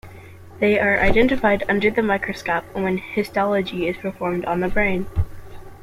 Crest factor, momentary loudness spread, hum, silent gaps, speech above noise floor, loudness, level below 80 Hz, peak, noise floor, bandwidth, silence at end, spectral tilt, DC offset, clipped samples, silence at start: 18 dB; 8 LU; none; none; 21 dB; -21 LUFS; -36 dBFS; -2 dBFS; -41 dBFS; 15.5 kHz; 0 s; -6.5 dB/octave; under 0.1%; under 0.1%; 0.05 s